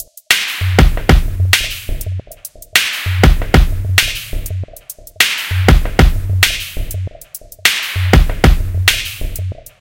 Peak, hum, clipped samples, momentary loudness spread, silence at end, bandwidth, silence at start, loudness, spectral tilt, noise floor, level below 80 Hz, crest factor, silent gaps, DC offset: 0 dBFS; none; 0.3%; 14 LU; 0.2 s; over 20 kHz; 0 s; -14 LUFS; -4 dB/octave; -35 dBFS; -18 dBFS; 14 dB; none; under 0.1%